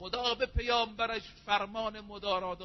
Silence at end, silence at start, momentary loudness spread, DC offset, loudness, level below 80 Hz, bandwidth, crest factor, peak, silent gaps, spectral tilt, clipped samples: 0 s; 0 s; 9 LU; under 0.1%; -33 LUFS; -46 dBFS; 6.2 kHz; 20 dB; -14 dBFS; none; -1.5 dB/octave; under 0.1%